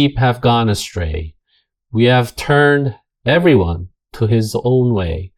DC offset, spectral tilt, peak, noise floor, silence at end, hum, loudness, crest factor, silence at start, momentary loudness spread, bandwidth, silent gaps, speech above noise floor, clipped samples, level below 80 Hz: under 0.1%; -6.5 dB/octave; 0 dBFS; -64 dBFS; 0.1 s; none; -15 LUFS; 16 dB; 0 s; 12 LU; 14.5 kHz; none; 49 dB; under 0.1%; -36 dBFS